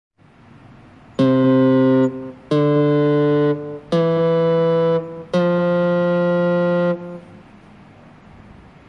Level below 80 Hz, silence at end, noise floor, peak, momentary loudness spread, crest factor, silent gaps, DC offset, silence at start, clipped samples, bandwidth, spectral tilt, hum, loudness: -58 dBFS; 1.65 s; -47 dBFS; -6 dBFS; 9 LU; 12 dB; none; under 0.1%; 1.2 s; under 0.1%; 7.2 kHz; -9 dB/octave; none; -17 LUFS